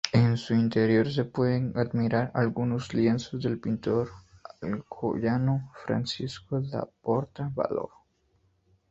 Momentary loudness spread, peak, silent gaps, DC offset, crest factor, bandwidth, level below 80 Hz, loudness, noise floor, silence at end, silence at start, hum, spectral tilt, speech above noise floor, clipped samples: 10 LU; -4 dBFS; none; under 0.1%; 24 dB; 8 kHz; -58 dBFS; -28 LUFS; -69 dBFS; 1.05 s; 0.05 s; none; -7 dB/octave; 41 dB; under 0.1%